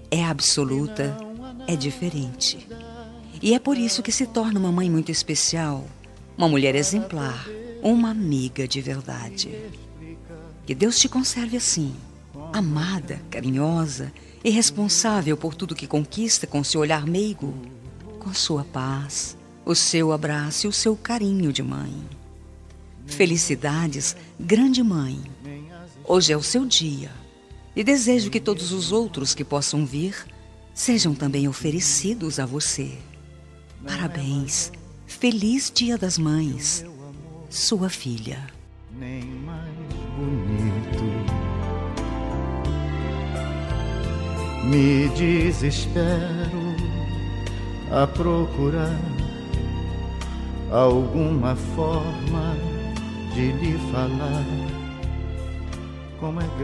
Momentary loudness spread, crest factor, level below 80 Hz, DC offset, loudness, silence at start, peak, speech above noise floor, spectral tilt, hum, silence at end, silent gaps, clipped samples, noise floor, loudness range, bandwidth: 16 LU; 22 dB; -38 dBFS; under 0.1%; -23 LUFS; 0 s; -2 dBFS; 22 dB; -4 dB/octave; none; 0 s; none; under 0.1%; -45 dBFS; 5 LU; 12.5 kHz